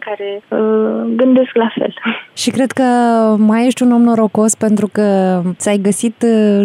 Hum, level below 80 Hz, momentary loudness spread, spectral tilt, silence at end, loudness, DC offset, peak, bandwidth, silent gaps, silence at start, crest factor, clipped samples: none; -68 dBFS; 7 LU; -5.5 dB/octave; 0 s; -13 LUFS; under 0.1%; -2 dBFS; 13.5 kHz; none; 0 s; 10 dB; under 0.1%